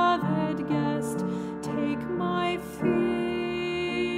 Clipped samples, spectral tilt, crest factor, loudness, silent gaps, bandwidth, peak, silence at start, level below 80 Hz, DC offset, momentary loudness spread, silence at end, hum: under 0.1%; -6.5 dB/octave; 16 dB; -28 LUFS; none; 15.5 kHz; -12 dBFS; 0 s; -56 dBFS; under 0.1%; 4 LU; 0 s; none